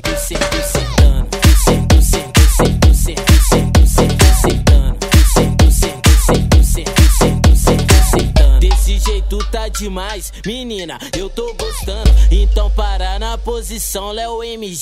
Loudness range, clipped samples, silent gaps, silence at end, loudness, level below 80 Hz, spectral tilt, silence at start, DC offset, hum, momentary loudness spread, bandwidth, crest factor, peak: 6 LU; under 0.1%; none; 0 s; -13 LUFS; -12 dBFS; -5 dB/octave; 0.05 s; under 0.1%; none; 12 LU; 16 kHz; 12 dB; 0 dBFS